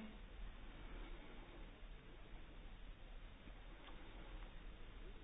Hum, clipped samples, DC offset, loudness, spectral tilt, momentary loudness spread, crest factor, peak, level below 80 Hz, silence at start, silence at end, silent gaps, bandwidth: none; under 0.1%; under 0.1%; -59 LUFS; -4 dB/octave; 4 LU; 12 dB; -42 dBFS; -56 dBFS; 0 s; 0 s; none; 3.9 kHz